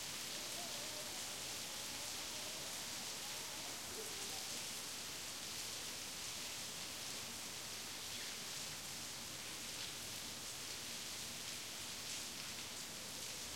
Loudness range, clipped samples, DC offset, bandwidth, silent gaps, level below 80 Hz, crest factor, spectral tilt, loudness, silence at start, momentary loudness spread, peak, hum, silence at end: 1 LU; under 0.1%; under 0.1%; 16.5 kHz; none; -74 dBFS; 18 dB; -0.5 dB/octave; -44 LUFS; 0 s; 2 LU; -30 dBFS; none; 0 s